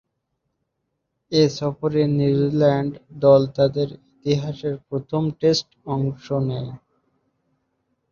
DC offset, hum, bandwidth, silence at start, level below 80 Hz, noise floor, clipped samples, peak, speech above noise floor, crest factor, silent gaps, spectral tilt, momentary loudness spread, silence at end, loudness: under 0.1%; none; 7.2 kHz; 1.3 s; -56 dBFS; -76 dBFS; under 0.1%; -2 dBFS; 56 dB; 20 dB; none; -7 dB/octave; 12 LU; 1.35 s; -21 LUFS